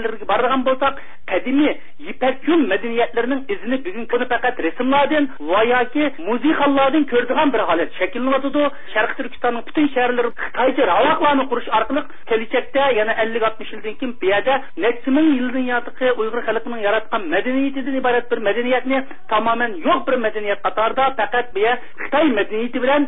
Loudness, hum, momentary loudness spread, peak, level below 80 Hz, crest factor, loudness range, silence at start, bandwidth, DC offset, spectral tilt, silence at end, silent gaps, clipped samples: -19 LUFS; none; 7 LU; -4 dBFS; -54 dBFS; 14 dB; 2 LU; 0 s; 4 kHz; 5%; -9.5 dB/octave; 0 s; none; under 0.1%